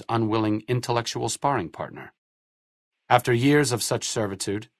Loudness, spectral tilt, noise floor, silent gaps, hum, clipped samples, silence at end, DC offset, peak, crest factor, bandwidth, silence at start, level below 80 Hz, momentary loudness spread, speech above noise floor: -24 LUFS; -4.5 dB/octave; under -90 dBFS; 2.18-2.92 s; none; under 0.1%; 0.15 s; under 0.1%; -2 dBFS; 22 dB; 12 kHz; 0 s; -60 dBFS; 12 LU; over 66 dB